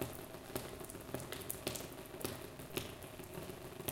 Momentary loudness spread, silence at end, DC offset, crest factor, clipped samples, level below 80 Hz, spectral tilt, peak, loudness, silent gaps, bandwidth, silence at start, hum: 7 LU; 0 s; under 0.1%; 26 dB; under 0.1%; -62 dBFS; -4 dB/octave; -20 dBFS; -46 LUFS; none; 17 kHz; 0 s; none